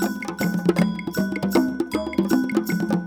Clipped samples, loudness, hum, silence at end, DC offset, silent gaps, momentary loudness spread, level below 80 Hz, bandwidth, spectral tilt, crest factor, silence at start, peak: under 0.1%; -23 LUFS; none; 0 s; under 0.1%; none; 5 LU; -50 dBFS; over 20 kHz; -6.5 dB/octave; 18 dB; 0 s; -4 dBFS